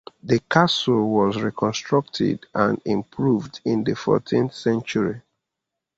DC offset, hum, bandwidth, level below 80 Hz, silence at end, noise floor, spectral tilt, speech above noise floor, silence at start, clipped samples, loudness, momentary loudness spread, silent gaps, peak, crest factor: under 0.1%; none; 8 kHz; -56 dBFS; 0.8 s; -83 dBFS; -6 dB/octave; 62 dB; 0.25 s; under 0.1%; -22 LUFS; 6 LU; none; -2 dBFS; 20 dB